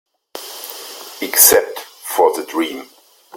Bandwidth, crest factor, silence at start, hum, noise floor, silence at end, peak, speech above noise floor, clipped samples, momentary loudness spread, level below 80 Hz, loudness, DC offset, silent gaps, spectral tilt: 17 kHz; 18 dB; 0.35 s; none; -34 dBFS; 0 s; 0 dBFS; 20 dB; under 0.1%; 23 LU; -56 dBFS; -13 LUFS; under 0.1%; none; -0.5 dB/octave